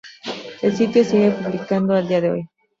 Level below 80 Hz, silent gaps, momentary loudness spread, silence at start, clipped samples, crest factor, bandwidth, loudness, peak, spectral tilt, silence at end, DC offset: -60 dBFS; none; 14 LU; 0.05 s; under 0.1%; 16 dB; 7.6 kHz; -19 LUFS; -4 dBFS; -7 dB/octave; 0.35 s; under 0.1%